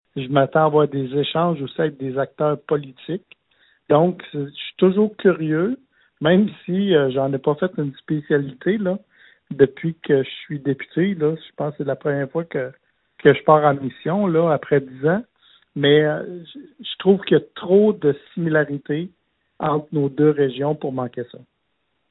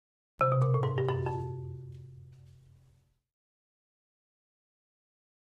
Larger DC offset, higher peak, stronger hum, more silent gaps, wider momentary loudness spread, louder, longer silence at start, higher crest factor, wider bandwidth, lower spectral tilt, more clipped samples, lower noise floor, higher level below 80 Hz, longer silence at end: neither; first, 0 dBFS vs -16 dBFS; neither; neither; second, 13 LU vs 22 LU; first, -20 LUFS vs -31 LUFS; second, 0.15 s vs 0.4 s; about the same, 20 dB vs 20 dB; about the same, 4.1 kHz vs 4.1 kHz; first, -11 dB/octave vs -9 dB/octave; neither; first, -72 dBFS vs -67 dBFS; about the same, -62 dBFS vs -64 dBFS; second, 0.75 s vs 3.1 s